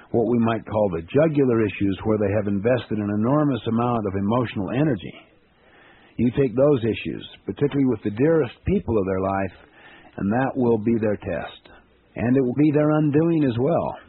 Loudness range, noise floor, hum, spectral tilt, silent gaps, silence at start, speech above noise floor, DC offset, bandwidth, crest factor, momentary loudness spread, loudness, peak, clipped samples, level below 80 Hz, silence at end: 3 LU; -55 dBFS; none; -7.5 dB/octave; none; 0.15 s; 34 dB; under 0.1%; 4.2 kHz; 16 dB; 10 LU; -22 LUFS; -6 dBFS; under 0.1%; -48 dBFS; 0.1 s